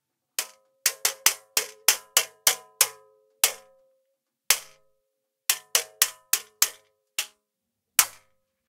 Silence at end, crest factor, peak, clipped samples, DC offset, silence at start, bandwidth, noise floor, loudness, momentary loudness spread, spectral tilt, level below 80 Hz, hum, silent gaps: 0.6 s; 28 dB; 0 dBFS; under 0.1%; under 0.1%; 0.4 s; 18 kHz; -82 dBFS; -24 LUFS; 10 LU; 3 dB/octave; -74 dBFS; none; none